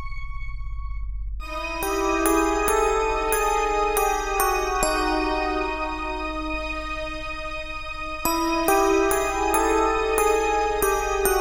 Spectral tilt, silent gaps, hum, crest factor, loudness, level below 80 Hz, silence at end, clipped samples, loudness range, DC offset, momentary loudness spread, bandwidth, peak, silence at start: -3.5 dB/octave; none; none; 20 dB; -23 LUFS; -34 dBFS; 0 s; under 0.1%; 5 LU; 0.1%; 14 LU; 16 kHz; -2 dBFS; 0 s